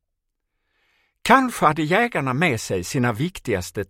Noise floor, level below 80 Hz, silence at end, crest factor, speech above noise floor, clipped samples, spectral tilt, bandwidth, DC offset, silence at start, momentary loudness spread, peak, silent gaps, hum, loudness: -77 dBFS; -52 dBFS; 0.05 s; 22 dB; 57 dB; under 0.1%; -5 dB/octave; 16.5 kHz; under 0.1%; 1.25 s; 9 LU; 0 dBFS; none; none; -20 LUFS